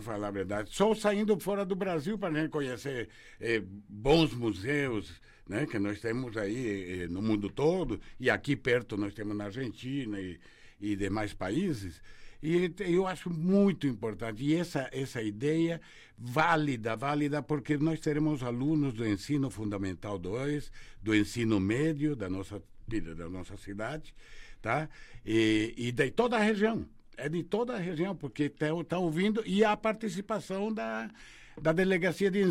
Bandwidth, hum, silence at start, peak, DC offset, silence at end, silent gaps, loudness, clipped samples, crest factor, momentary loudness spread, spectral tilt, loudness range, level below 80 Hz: 15 kHz; none; 0 s; -14 dBFS; under 0.1%; 0 s; none; -32 LUFS; under 0.1%; 18 dB; 12 LU; -6.5 dB/octave; 4 LU; -52 dBFS